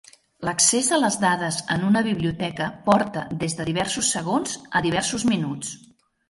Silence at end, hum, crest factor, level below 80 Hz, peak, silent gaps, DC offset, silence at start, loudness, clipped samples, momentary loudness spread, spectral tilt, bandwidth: 0.55 s; none; 18 dB; -54 dBFS; -4 dBFS; none; under 0.1%; 0.4 s; -22 LUFS; under 0.1%; 9 LU; -3.5 dB/octave; 11.5 kHz